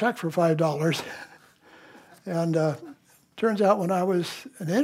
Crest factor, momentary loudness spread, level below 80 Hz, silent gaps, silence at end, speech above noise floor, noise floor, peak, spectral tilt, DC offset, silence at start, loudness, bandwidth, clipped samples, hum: 18 dB; 18 LU; -76 dBFS; none; 0 s; 29 dB; -54 dBFS; -8 dBFS; -6.5 dB/octave; under 0.1%; 0 s; -25 LUFS; 16 kHz; under 0.1%; none